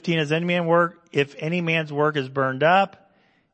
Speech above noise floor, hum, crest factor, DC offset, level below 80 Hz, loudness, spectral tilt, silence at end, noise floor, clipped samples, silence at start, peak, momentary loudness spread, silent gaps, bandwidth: 39 dB; none; 18 dB; under 0.1%; -72 dBFS; -22 LUFS; -6.5 dB/octave; 0.65 s; -61 dBFS; under 0.1%; 0.05 s; -4 dBFS; 7 LU; none; 8.6 kHz